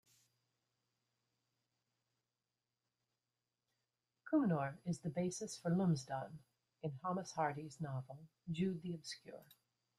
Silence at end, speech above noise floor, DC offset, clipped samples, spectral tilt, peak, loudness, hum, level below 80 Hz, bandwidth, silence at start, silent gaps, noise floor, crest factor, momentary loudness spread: 0.55 s; over 49 dB; under 0.1%; under 0.1%; -6.5 dB/octave; -24 dBFS; -41 LUFS; none; -80 dBFS; 13.5 kHz; 4.25 s; none; under -90 dBFS; 20 dB; 18 LU